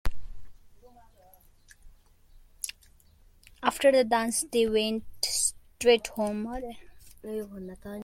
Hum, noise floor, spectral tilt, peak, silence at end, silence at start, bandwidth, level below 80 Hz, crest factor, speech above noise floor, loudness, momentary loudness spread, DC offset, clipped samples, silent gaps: none; -58 dBFS; -2.5 dB/octave; -8 dBFS; 0 s; 0.05 s; 16.5 kHz; -48 dBFS; 20 dB; 31 dB; -27 LUFS; 18 LU; under 0.1%; under 0.1%; none